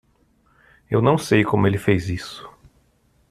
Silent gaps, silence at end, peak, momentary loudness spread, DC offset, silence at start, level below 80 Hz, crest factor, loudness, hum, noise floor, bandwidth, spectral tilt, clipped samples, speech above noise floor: none; 0.8 s; -2 dBFS; 14 LU; under 0.1%; 0.9 s; -50 dBFS; 20 dB; -20 LUFS; none; -61 dBFS; 14 kHz; -6.5 dB/octave; under 0.1%; 42 dB